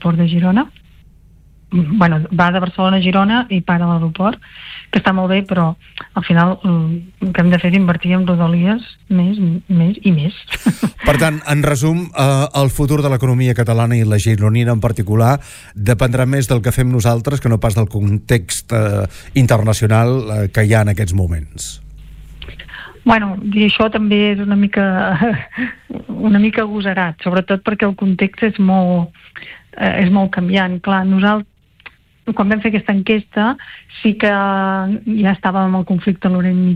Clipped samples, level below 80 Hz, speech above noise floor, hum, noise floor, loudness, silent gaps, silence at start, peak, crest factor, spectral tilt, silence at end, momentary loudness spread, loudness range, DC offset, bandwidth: under 0.1%; -36 dBFS; 31 dB; none; -45 dBFS; -15 LUFS; none; 0 s; -2 dBFS; 12 dB; -6.5 dB/octave; 0 s; 8 LU; 2 LU; under 0.1%; 15.5 kHz